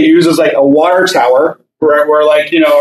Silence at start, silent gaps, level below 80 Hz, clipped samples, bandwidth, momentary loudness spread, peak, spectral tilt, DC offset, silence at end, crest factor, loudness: 0 s; none; -60 dBFS; under 0.1%; 14 kHz; 4 LU; 0 dBFS; -5 dB/octave; under 0.1%; 0 s; 8 dB; -9 LUFS